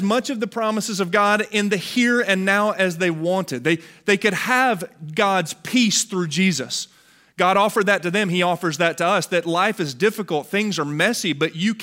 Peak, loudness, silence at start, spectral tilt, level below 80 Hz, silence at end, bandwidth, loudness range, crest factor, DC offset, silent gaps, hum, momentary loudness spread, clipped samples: -2 dBFS; -20 LUFS; 0 s; -4 dB/octave; -68 dBFS; 0 s; 16 kHz; 1 LU; 18 dB; under 0.1%; none; none; 6 LU; under 0.1%